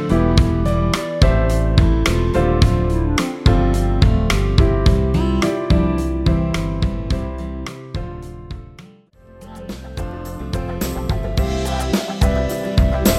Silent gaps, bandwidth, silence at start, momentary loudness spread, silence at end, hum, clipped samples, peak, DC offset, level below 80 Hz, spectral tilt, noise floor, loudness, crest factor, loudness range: none; 15.5 kHz; 0 s; 14 LU; 0 s; none; under 0.1%; 0 dBFS; under 0.1%; -20 dBFS; -6.5 dB/octave; -46 dBFS; -18 LUFS; 16 dB; 13 LU